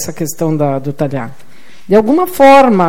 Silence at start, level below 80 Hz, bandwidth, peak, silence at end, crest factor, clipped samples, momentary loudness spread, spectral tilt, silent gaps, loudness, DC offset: 0 s; -48 dBFS; 17 kHz; 0 dBFS; 0 s; 12 dB; under 0.1%; 14 LU; -6 dB/octave; none; -11 LUFS; 5%